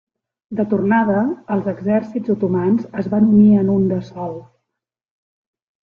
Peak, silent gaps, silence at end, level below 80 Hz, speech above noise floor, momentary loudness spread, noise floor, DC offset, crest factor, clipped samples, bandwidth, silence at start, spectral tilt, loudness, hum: -4 dBFS; none; 1.5 s; -56 dBFS; 65 dB; 16 LU; -82 dBFS; under 0.1%; 16 dB; under 0.1%; 4.2 kHz; 0.5 s; -10.5 dB/octave; -17 LUFS; none